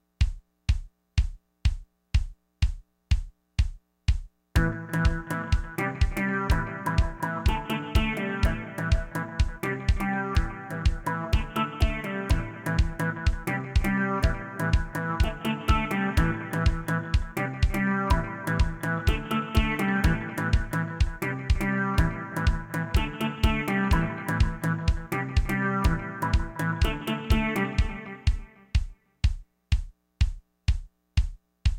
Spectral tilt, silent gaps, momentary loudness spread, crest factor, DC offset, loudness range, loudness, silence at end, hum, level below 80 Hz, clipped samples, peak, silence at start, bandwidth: -6 dB/octave; none; 6 LU; 18 dB; under 0.1%; 4 LU; -28 LUFS; 0 s; none; -30 dBFS; under 0.1%; -8 dBFS; 0.2 s; 17 kHz